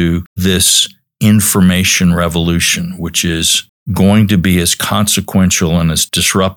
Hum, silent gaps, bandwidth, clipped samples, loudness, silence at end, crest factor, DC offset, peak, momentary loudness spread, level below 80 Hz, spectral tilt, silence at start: none; 0.26-0.36 s, 3.69-3.86 s; 19.5 kHz; under 0.1%; -11 LUFS; 0 s; 12 dB; under 0.1%; 0 dBFS; 7 LU; -38 dBFS; -3.5 dB/octave; 0 s